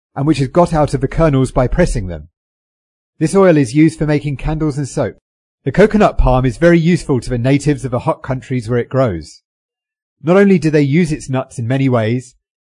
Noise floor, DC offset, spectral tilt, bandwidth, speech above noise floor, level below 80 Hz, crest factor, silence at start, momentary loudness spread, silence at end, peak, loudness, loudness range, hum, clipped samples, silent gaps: under -90 dBFS; under 0.1%; -7.5 dB/octave; 11 kHz; over 77 dB; -28 dBFS; 14 dB; 0.15 s; 10 LU; 0.4 s; 0 dBFS; -14 LUFS; 2 LU; none; under 0.1%; 2.37-3.13 s, 5.21-5.58 s, 9.45-9.69 s, 10.02-10.16 s